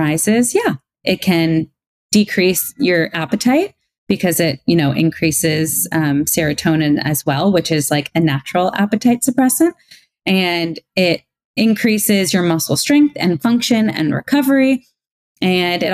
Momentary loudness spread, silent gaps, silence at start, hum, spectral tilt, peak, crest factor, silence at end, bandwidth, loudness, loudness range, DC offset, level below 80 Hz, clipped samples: 5 LU; 1.87-2.09 s, 3.98-4.07 s, 11.45-11.54 s, 15.12-15.35 s; 0 s; none; -4.5 dB/octave; -2 dBFS; 14 dB; 0 s; 16 kHz; -16 LUFS; 2 LU; under 0.1%; -52 dBFS; under 0.1%